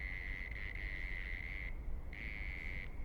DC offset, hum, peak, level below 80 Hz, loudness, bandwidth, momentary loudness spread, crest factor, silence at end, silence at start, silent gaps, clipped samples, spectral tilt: under 0.1%; none; -30 dBFS; -44 dBFS; -45 LUFS; 18.5 kHz; 3 LU; 12 dB; 0 s; 0 s; none; under 0.1%; -6 dB/octave